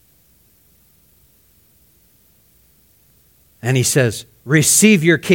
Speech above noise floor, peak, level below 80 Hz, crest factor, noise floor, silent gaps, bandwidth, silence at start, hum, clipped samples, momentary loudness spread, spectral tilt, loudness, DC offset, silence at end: 41 dB; 0 dBFS; -56 dBFS; 18 dB; -55 dBFS; none; 17 kHz; 3.65 s; none; under 0.1%; 13 LU; -4 dB/octave; -14 LUFS; under 0.1%; 0 s